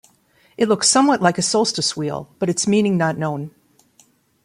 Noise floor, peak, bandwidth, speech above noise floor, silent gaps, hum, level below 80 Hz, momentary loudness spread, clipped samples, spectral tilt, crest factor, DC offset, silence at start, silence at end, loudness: -57 dBFS; -2 dBFS; 15.5 kHz; 39 dB; none; none; -60 dBFS; 12 LU; under 0.1%; -4 dB/octave; 18 dB; under 0.1%; 0.6 s; 0.95 s; -18 LUFS